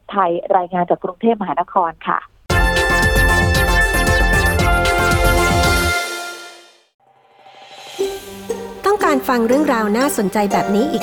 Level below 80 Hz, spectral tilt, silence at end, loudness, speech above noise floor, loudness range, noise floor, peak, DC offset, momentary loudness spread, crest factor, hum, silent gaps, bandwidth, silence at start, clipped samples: -26 dBFS; -4.5 dB/octave; 0 s; -16 LUFS; 31 dB; 8 LU; -48 dBFS; -2 dBFS; under 0.1%; 10 LU; 16 dB; none; 6.94-6.99 s; over 20 kHz; 0.1 s; under 0.1%